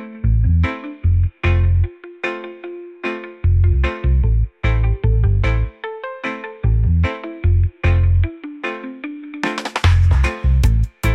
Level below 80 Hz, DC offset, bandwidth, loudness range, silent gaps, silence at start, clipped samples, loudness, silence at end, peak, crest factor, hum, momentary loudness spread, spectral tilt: -20 dBFS; under 0.1%; 9.2 kHz; 1 LU; none; 0 s; under 0.1%; -19 LUFS; 0 s; -4 dBFS; 12 dB; none; 11 LU; -7 dB/octave